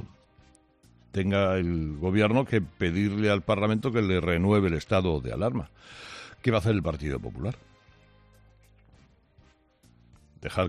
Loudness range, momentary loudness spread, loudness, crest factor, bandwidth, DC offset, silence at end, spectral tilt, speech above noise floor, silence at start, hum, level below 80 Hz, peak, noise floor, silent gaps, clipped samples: 13 LU; 17 LU; -27 LUFS; 18 dB; 12 kHz; under 0.1%; 0 s; -7.5 dB/octave; 35 dB; 0 s; none; -48 dBFS; -10 dBFS; -61 dBFS; none; under 0.1%